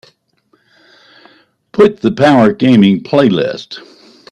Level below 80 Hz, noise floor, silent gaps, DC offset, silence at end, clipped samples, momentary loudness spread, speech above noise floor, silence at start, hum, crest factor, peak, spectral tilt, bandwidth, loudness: -52 dBFS; -57 dBFS; none; under 0.1%; 0.5 s; under 0.1%; 16 LU; 47 dB; 1.75 s; none; 12 dB; 0 dBFS; -7.5 dB/octave; 9.6 kHz; -11 LUFS